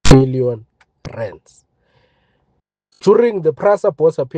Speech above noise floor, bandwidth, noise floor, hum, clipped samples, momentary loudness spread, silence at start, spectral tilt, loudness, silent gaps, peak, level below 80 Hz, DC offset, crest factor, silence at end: 52 dB; 9.8 kHz; -66 dBFS; none; 0.2%; 18 LU; 0.05 s; -6.5 dB/octave; -15 LUFS; none; 0 dBFS; -32 dBFS; under 0.1%; 16 dB; 0 s